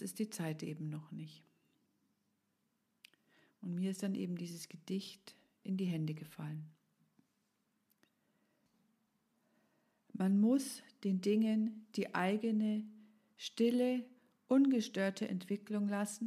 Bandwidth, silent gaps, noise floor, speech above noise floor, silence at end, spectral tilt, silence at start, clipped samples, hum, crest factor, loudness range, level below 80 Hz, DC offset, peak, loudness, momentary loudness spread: 14.5 kHz; none; -82 dBFS; 46 dB; 0 s; -6 dB/octave; 0 s; under 0.1%; none; 18 dB; 13 LU; under -90 dBFS; under 0.1%; -20 dBFS; -37 LUFS; 18 LU